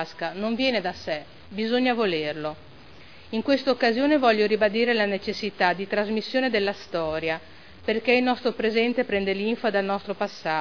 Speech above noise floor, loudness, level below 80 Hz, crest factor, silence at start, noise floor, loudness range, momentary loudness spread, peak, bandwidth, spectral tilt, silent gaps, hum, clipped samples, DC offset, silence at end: 24 dB; -24 LUFS; -58 dBFS; 18 dB; 0 s; -48 dBFS; 4 LU; 10 LU; -6 dBFS; 5.4 kHz; -5.5 dB/octave; none; none; under 0.1%; 0.4%; 0 s